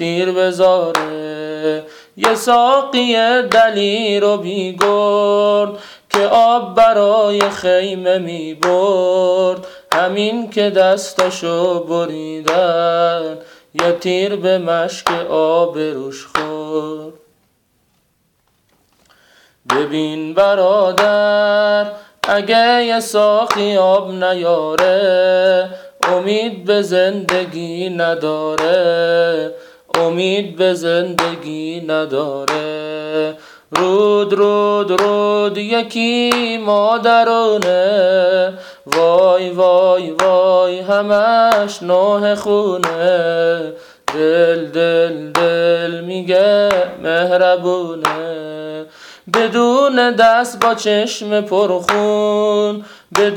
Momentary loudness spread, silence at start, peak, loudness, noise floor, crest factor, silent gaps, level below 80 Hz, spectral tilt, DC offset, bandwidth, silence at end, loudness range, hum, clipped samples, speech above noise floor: 10 LU; 0 s; -2 dBFS; -14 LUFS; -61 dBFS; 12 dB; none; -58 dBFS; -4.5 dB/octave; under 0.1%; 18.5 kHz; 0 s; 5 LU; none; under 0.1%; 47 dB